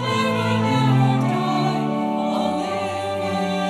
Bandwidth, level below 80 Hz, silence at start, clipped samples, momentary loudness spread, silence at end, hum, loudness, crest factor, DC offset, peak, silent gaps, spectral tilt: 13 kHz; -62 dBFS; 0 s; under 0.1%; 7 LU; 0 s; none; -21 LUFS; 14 dB; under 0.1%; -8 dBFS; none; -6.5 dB/octave